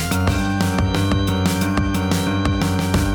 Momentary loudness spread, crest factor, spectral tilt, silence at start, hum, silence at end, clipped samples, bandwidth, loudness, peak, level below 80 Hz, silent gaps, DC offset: 1 LU; 14 dB; -5.5 dB/octave; 0 s; none; 0 s; under 0.1%; over 20 kHz; -19 LUFS; -4 dBFS; -30 dBFS; none; under 0.1%